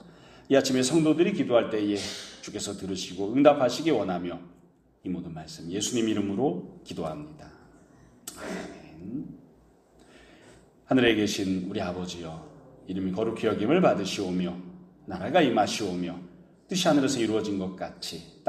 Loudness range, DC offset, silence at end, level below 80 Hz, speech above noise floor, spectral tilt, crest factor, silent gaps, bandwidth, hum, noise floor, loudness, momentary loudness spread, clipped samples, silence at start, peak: 10 LU; under 0.1%; 0.2 s; -62 dBFS; 32 dB; -5 dB/octave; 24 dB; none; 14 kHz; none; -59 dBFS; -27 LUFS; 18 LU; under 0.1%; 0.05 s; -4 dBFS